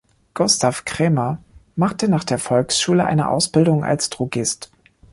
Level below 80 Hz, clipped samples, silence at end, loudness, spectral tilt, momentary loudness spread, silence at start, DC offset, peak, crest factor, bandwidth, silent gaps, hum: -52 dBFS; under 0.1%; 0.5 s; -19 LUFS; -4.5 dB/octave; 8 LU; 0.35 s; under 0.1%; -2 dBFS; 16 dB; 11.5 kHz; none; none